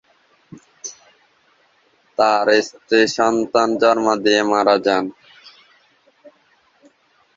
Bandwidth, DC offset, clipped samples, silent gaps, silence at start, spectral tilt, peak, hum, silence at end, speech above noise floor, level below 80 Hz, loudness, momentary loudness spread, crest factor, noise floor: 7.8 kHz; under 0.1%; under 0.1%; none; 0.55 s; -3.5 dB/octave; -2 dBFS; none; 2.25 s; 43 dB; -62 dBFS; -17 LUFS; 16 LU; 18 dB; -59 dBFS